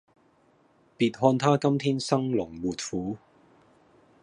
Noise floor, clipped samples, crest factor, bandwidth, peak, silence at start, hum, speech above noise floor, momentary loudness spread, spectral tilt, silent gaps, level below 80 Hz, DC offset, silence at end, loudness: -63 dBFS; under 0.1%; 22 dB; 11 kHz; -6 dBFS; 1 s; none; 38 dB; 10 LU; -6 dB/octave; none; -62 dBFS; under 0.1%; 1.05 s; -26 LUFS